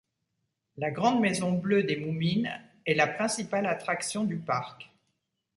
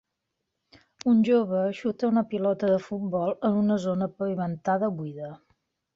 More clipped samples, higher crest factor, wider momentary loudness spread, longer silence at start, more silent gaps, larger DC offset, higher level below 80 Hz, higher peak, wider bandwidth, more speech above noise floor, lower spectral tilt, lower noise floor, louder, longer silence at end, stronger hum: neither; first, 20 dB vs 14 dB; about the same, 9 LU vs 8 LU; second, 0.75 s vs 1.05 s; neither; neither; about the same, -70 dBFS vs -68 dBFS; about the same, -10 dBFS vs -12 dBFS; first, 11.5 kHz vs 7.6 kHz; second, 52 dB vs 57 dB; second, -5 dB/octave vs -8 dB/octave; about the same, -81 dBFS vs -82 dBFS; second, -29 LUFS vs -26 LUFS; first, 0.75 s vs 0.6 s; neither